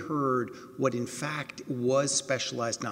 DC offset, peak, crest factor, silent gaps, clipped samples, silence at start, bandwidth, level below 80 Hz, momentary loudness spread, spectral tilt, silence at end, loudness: under 0.1%; -14 dBFS; 16 dB; none; under 0.1%; 0 s; 16 kHz; -72 dBFS; 9 LU; -4 dB/octave; 0 s; -30 LUFS